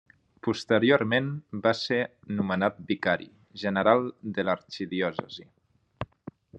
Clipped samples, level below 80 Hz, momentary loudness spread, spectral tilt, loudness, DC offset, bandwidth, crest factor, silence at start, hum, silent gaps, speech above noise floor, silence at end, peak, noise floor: under 0.1%; -66 dBFS; 18 LU; -6 dB/octave; -27 LUFS; under 0.1%; 8.8 kHz; 22 dB; 0.45 s; none; none; 21 dB; 0 s; -6 dBFS; -48 dBFS